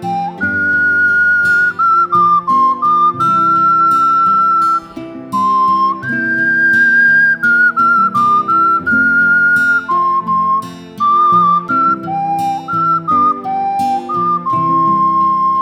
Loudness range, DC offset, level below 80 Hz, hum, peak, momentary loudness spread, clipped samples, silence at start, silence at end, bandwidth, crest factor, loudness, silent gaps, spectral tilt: 4 LU; under 0.1%; -58 dBFS; none; -2 dBFS; 7 LU; under 0.1%; 0 s; 0 s; 15.5 kHz; 10 dB; -11 LUFS; none; -5.5 dB/octave